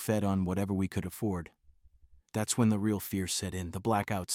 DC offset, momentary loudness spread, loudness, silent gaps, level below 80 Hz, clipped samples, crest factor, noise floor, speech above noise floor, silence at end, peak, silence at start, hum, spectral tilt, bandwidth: under 0.1%; 9 LU; -32 LUFS; none; -62 dBFS; under 0.1%; 18 dB; -61 dBFS; 30 dB; 0 s; -14 dBFS; 0 s; none; -5 dB/octave; 17 kHz